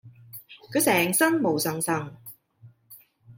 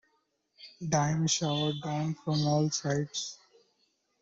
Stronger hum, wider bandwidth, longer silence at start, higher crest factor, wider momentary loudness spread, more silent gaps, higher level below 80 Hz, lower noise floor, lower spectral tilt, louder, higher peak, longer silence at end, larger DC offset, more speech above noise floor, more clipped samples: neither; first, 17 kHz vs 7.8 kHz; second, 0.05 s vs 0.6 s; about the same, 20 dB vs 20 dB; first, 23 LU vs 8 LU; neither; about the same, -70 dBFS vs -66 dBFS; second, -54 dBFS vs -75 dBFS; about the same, -3.5 dB/octave vs -4.5 dB/octave; first, -23 LUFS vs -30 LUFS; first, -8 dBFS vs -12 dBFS; second, 0.05 s vs 0.85 s; neither; second, 31 dB vs 45 dB; neither